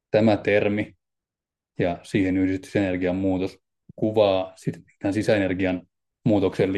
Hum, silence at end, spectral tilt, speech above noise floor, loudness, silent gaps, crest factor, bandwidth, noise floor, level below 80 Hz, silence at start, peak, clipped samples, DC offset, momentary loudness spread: none; 0 s; -7 dB/octave; 67 dB; -24 LUFS; none; 18 dB; 12 kHz; -89 dBFS; -60 dBFS; 0.15 s; -6 dBFS; under 0.1%; under 0.1%; 12 LU